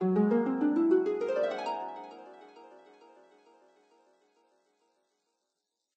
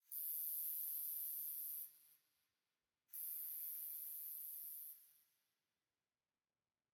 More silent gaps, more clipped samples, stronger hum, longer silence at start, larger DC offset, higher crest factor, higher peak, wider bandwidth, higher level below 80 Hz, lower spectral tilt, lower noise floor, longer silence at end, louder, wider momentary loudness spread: neither; neither; neither; about the same, 0 s vs 0.1 s; neither; about the same, 18 dB vs 20 dB; first, -16 dBFS vs -32 dBFS; second, 8 kHz vs 18 kHz; first, -84 dBFS vs under -90 dBFS; first, -8.5 dB/octave vs 3.5 dB/octave; second, -85 dBFS vs under -90 dBFS; first, 3.3 s vs 1.8 s; first, -29 LUFS vs -45 LUFS; first, 23 LU vs 10 LU